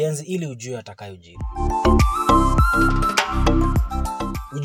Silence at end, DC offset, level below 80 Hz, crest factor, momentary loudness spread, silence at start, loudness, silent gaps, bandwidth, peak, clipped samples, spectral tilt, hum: 0 s; under 0.1%; -24 dBFS; 16 dB; 16 LU; 0 s; -20 LUFS; none; 17 kHz; -4 dBFS; under 0.1%; -5.5 dB/octave; none